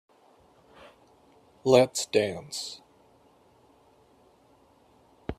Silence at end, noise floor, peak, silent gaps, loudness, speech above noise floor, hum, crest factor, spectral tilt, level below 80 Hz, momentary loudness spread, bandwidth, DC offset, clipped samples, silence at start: 0.05 s; -61 dBFS; -6 dBFS; none; -26 LUFS; 36 dB; none; 26 dB; -4 dB/octave; -60 dBFS; 19 LU; 14 kHz; under 0.1%; under 0.1%; 1.65 s